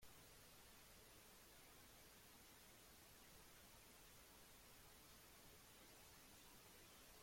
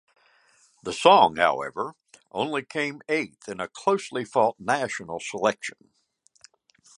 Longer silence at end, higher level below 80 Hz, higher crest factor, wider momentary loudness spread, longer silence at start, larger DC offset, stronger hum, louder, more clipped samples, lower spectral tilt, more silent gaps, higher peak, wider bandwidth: second, 0 s vs 1.25 s; second, -76 dBFS vs -66 dBFS; second, 14 dB vs 24 dB; second, 1 LU vs 17 LU; second, 0 s vs 0.85 s; neither; neither; second, -65 LUFS vs -25 LUFS; neither; second, -2 dB/octave vs -3.5 dB/octave; neither; second, -52 dBFS vs -2 dBFS; first, 16.5 kHz vs 11.5 kHz